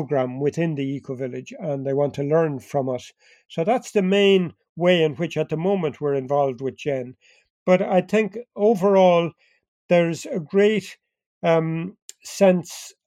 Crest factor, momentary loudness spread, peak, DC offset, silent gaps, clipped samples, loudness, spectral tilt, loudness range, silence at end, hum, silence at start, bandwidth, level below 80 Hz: 18 dB; 12 LU; -4 dBFS; under 0.1%; 4.69-4.76 s, 7.50-7.66 s, 9.68-9.89 s, 11.26-11.41 s, 12.02-12.09 s; under 0.1%; -22 LUFS; -6 dB/octave; 4 LU; 0.15 s; none; 0 s; 14.5 kHz; -70 dBFS